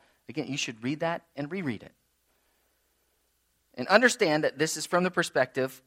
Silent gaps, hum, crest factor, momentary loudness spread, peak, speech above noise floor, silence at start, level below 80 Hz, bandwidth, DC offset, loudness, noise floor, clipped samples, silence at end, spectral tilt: none; none; 26 dB; 16 LU; -4 dBFS; 45 dB; 0.3 s; -74 dBFS; 16 kHz; under 0.1%; -27 LUFS; -73 dBFS; under 0.1%; 0.1 s; -4 dB/octave